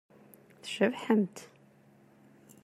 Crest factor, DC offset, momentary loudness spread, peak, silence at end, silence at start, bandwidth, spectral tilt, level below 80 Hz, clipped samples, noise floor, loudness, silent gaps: 22 dB; under 0.1%; 18 LU; -12 dBFS; 1.2 s; 0.65 s; 14 kHz; -5.5 dB/octave; -84 dBFS; under 0.1%; -61 dBFS; -30 LUFS; none